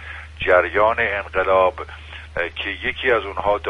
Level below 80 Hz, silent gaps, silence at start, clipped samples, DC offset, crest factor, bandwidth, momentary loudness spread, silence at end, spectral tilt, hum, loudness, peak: -40 dBFS; none; 0 s; under 0.1%; under 0.1%; 18 dB; 9.8 kHz; 16 LU; 0 s; -6 dB/octave; none; -19 LUFS; -2 dBFS